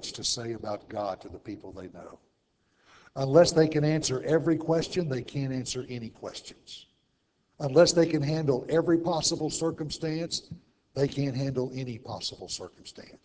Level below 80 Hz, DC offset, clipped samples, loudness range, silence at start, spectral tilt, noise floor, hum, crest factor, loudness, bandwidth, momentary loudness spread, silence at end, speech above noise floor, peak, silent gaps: -58 dBFS; under 0.1%; under 0.1%; 7 LU; 0 s; -5 dB/octave; -73 dBFS; none; 22 dB; -28 LUFS; 8 kHz; 22 LU; 0.1 s; 45 dB; -6 dBFS; none